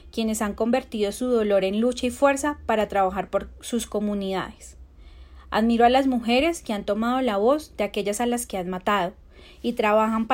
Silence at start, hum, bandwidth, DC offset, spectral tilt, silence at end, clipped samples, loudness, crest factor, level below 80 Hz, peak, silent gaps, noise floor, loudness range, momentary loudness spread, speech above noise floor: 0.05 s; none; 16.5 kHz; under 0.1%; -4.5 dB/octave; 0 s; under 0.1%; -24 LUFS; 16 dB; -48 dBFS; -6 dBFS; none; -46 dBFS; 3 LU; 9 LU; 23 dB